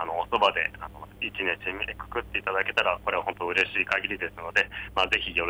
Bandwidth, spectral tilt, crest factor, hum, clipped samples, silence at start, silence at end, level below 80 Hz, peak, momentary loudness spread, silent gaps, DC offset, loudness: over 20 kHz; -3.5 dB/octave; 18 dB; 50 Hz at -50 dBFS; under 0.1%; 0 s; 0 s; -50 dBFS; -10 dBFS; 9 LU; none; under 0.1%; -27 LUFS